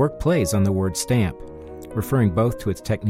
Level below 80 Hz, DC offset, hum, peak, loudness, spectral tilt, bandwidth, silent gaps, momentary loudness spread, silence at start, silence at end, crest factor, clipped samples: -40 dBFS; under 0.1%; none; -8 dBFS; -22 LUFS; -6.5 dB/octave; 16.5 kHz; none; 14 LU; 0 s; 0 s; 14 dB; under 0.1%